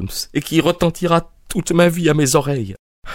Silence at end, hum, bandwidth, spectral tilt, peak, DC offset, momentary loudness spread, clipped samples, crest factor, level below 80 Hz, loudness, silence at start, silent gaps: 0 s; none; 16.5 kHz; -5 dB/octave; 0 dBFS; under 0.1%; 10 LU; under 0.1%; 18 dB; -38 dBFS; -17 LUFS; 0 s; 2.79-3.02 s